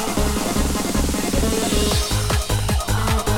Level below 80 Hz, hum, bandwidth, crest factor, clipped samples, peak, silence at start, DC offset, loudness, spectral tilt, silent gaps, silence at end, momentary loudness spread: -24 dBFS; none; 18 kHz; 12 dB; under 0.1%; -6 dBFS; 0 s; under 0.1%; -20 LUFS; -4 dB/octave; none; 0 s; 2 LU